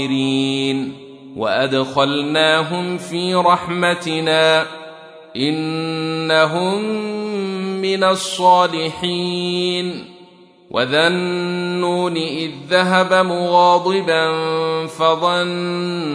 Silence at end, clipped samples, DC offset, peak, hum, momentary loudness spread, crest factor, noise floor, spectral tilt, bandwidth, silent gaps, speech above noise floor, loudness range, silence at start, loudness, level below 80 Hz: 0 s; under 0.1%; under 0.1%; 0 dBFS; none; 9 LU; 16 dB; -46 dBFS; -4.5 dB/octave; 11 kHz; none; 28 dB; 3 LU; 0 s; -17 LUFS; -64 dBFS